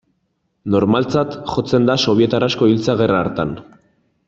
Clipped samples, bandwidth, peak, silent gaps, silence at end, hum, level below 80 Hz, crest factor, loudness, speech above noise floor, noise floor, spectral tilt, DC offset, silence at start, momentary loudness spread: under 0.1%; 7.8 kHz; -2 dBFS; none; 0.65 s; none; -50 dBFS; 16 dB; -17 LUFS; 52 dB; -68 dBFS; -6.5 dB/octave; under 0.1%; 0.65 s; 9 LU